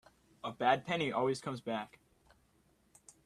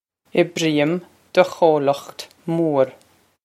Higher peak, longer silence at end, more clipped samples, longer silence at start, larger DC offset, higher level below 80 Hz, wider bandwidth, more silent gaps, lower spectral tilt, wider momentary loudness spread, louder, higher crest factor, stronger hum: second, -14 dBFS vs 0 dBFS; first, 1.4 s vs 0.5 s; neither; about the same, 0.45 s vs 0.35 s; neither; second, -74 dBFS vs -68 dBFS; second, 13.5 kHz vs 15 kHz; neither; about the same, -5 dB/octave vs -5.5 dB/octave; first, 14 LU vs 11 LU; second, -35 LUFS vs -20 LUFS; about the same, 24 dB vs 20 dB; neither